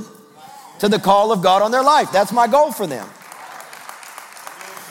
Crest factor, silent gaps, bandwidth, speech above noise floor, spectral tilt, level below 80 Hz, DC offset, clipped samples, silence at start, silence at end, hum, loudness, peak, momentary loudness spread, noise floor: 18 dB; none; 17 kHz; 26 dB; -4 dB/octave; -64 dBFS; under 0.1%; under 0.1%; 0 s; 0 s; none; -15 LUFS; -2 dBFS; 21 LU; -42 dBFS